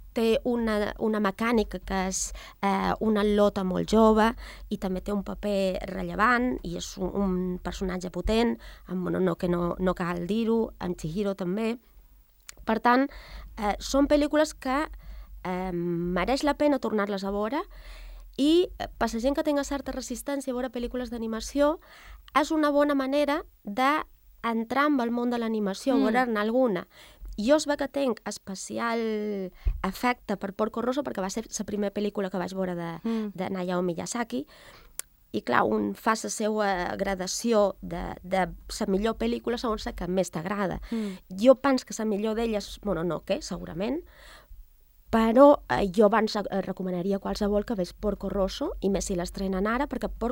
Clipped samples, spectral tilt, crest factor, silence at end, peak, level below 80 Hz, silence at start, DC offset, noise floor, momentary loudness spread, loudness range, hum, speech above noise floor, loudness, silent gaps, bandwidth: under 0.1%; -5 dB/octave; 22 dB; 0 s; -6 dBFS; -44 dBFS; 0 s; under 0.1%; -56 dBFS; 11 LU; 5 LU; none; 29 dB; -27 LUFS; none; 16.5 kHz